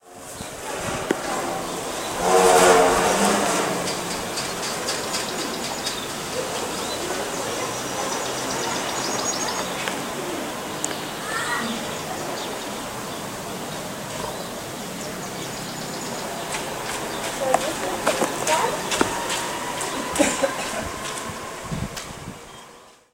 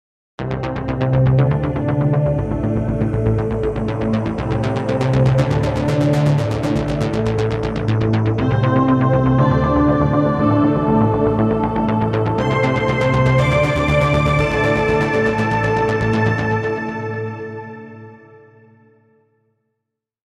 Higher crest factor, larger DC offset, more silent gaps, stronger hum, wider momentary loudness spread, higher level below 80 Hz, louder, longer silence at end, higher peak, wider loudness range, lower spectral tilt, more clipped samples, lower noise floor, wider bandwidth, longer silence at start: first, 24 dB vs 16 dB; neither; neither; neither; first, 11 LU vs 7 LU; second, -50 dBFS vs -32 dBFS; second, -24 LUFS vs -17 LUFS; second, 0.25 s vs 2.25 s; about the same, -2 dBFS vs -2 dBFS; first, 10 LU vs 6 LU; second, -2.5 dB/octave vs -8 dB/octave; neither; second, -47 dBFS vs -79 dBFS; first, 16 kHz vs 9.8 kHz; second, 0.05 s vs 0.4 s